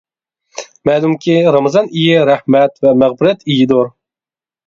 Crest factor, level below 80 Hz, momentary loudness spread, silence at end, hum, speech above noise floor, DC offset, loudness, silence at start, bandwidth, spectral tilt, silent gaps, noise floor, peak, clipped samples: 12 dB; -54 dBFS; 10 LU; 0.75 s; none; over 79 dB; under 0.1%; -12 LUFS; 0.55 s; 7.6 kHz; -6.5 dB/octave; none; under -90 dBFS; 0 dBFS; under 0.1%